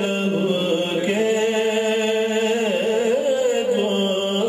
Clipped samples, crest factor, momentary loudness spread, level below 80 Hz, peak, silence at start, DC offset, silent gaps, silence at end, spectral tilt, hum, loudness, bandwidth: under 0.1%; 12 dB; 1 LU; -68 dBFS; -8 dBFS; 0 s; under 0.1%; none; 0 s; -4.5 dB/octave; none; -20 LUFS; 15.5 kHz